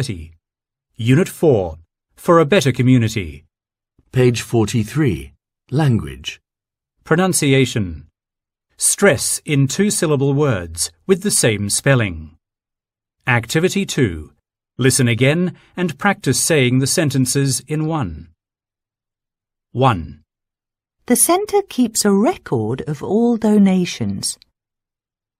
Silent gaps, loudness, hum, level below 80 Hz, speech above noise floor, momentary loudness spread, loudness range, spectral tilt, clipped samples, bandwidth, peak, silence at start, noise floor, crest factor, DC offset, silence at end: none; -17 LUFS; none; -46 dBFS; 72 dB; 12 LU; 4 LU; -5 dB/octave; under 0.1%; 16 kHz; 0 dBFS; 0 s; -88 dBFS; 18 dB; under 0.1%; 1.05 s